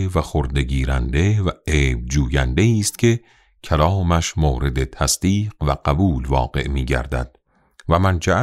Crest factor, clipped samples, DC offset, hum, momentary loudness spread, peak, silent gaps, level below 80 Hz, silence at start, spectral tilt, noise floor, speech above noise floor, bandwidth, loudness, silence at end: 16 dB; under 0.1%; under 0.1%; none; 5 LU; -2 dBFS; none; -26 dBFS; 0 s; -5.5 dB/octave; -52 dBFS; 33 dB; 15 kHz; -20 LUFS; 0 s